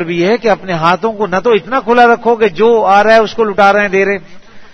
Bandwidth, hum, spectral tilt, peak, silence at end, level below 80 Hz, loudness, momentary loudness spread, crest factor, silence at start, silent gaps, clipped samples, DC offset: 7.4 kHz; none; -5.5 dB/octave; 0 dBFS; 0 s; -44 dBFS; -10 LUFS; 6 LU; 10 dB; 0 s; none; 0.5%; under 0.1%